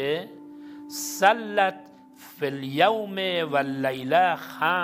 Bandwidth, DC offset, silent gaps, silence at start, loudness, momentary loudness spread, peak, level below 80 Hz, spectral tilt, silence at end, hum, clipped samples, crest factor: 16.5 kHz; under 0.1%; none; 0 s; -24 LUFS; 15 LU; -4 dBFS; -74 dBFS; -3.5 dB/octave; 0 s; none; under 0.1%; 20 dB